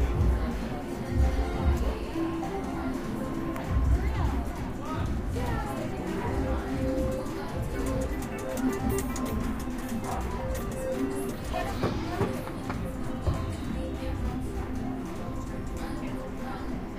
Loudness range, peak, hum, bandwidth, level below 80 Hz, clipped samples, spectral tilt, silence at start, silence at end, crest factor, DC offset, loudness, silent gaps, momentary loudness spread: 3 LU; -14 dBFS; none; 15.5 kHz; -34 dBFS; under 0.1%; -6.5 dB/octave; 0 s; 0 s; 16 dB; under 0.1%; -32 LUFS; none; 7 LU